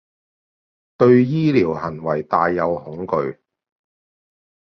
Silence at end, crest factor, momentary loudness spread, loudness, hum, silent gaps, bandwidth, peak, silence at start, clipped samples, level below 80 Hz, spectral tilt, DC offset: 1.35 s; 18 dB; 11 LU; -19 LUFS; none; none; 6.2 kHz; -2 dBFS; 1 s; under 0.1%; -54 dBFS; -9 dB/octave; under 0.1%